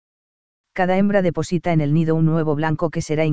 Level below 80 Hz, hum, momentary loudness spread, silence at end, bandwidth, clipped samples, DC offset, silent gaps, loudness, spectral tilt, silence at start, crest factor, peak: -48 dBFS; none; 6 LU; 0 s; 8 kHz; under 0.1%; 3%; none; -19 LUFS; -7.5 dB/octave; 0.65 s; 16 dB; -4 dBFS